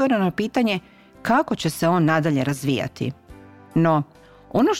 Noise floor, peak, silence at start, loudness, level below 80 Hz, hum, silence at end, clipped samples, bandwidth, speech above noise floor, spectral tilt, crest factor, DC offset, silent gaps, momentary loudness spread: -45 dBFS; -6 dBFS; 0 s; -22 LUFS; -56 dBFS; none; 0 s; under 0.1%; 16 kHz; 24 dB; -6 dB/octave; 16 dB; under 0.1%; none; 10 LU